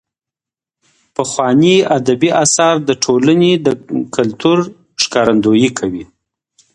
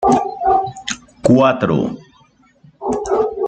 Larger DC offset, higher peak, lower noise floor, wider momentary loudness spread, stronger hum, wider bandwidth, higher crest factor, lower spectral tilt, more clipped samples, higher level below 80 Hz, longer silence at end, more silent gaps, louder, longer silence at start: neither; about the same, 0 dBFS vs -2 dBFS; first, -87 dBFS vs -52 dBFS; second, 10 LU vs 14 LU; neither; first, 11 kHz vs 9.2 kHz; about the same, 14 dB vs 16 dB; second, -4.5 dB/octave vs -6 dB/octave; neither; second, -52 dBFS vs -46 dBFS; first, 0.7 s vs 0 s; neither; first, -13 LUFS vs -17 LUFS; first, 1.2 s vs 0 s